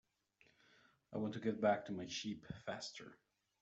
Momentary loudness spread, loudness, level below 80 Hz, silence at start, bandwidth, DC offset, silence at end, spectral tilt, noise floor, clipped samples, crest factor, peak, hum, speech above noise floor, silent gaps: 13 LU; -42 LUFS; -76 dBFS; 1.1 s; 8 kHz; under 0.1%; 0.45 s; -4 dB/octave; -75 dBFS; under 0.1%; 22 dB; -24 dBFS; none; 33 dB; none